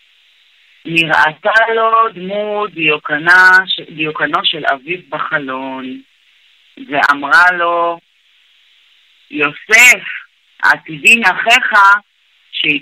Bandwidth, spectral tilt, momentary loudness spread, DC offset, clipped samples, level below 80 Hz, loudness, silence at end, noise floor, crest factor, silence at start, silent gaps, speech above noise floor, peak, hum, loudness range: 16 kHz; -2 dB/octave; 15 LU; under 0.1%; under 0.1%; -60 dBFS; -11 LUFS; 0 s; -52 dBFS; 14 dB; 0.85 s; none; 40 dB; 0 dBFS; none; 6 LU